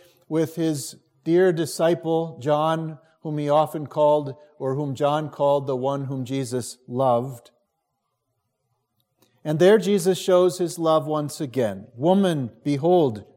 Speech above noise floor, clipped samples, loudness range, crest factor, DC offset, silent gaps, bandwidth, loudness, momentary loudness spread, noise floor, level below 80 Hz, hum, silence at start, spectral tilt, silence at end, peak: 55 dB; under 0.1%; 6 LU; 18 dB; under 0.1%; none; 16.5 kHz; -22 LUFS; 11 LU; -77 dBFS; -72 dBFS; none; 0.3 s; -6 dB/octave; 0.15 s; -6 dBFS